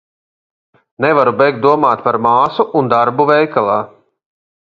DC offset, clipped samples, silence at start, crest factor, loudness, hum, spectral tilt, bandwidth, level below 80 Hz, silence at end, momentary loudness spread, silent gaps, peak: under 0.1%; under 0.1%; 1 s; 14 dB; -13 LUFS; none; -8 dB/octave; 7 kHz; -58 dBFS; 0.85 s; 5 LU; none; 0 dBFS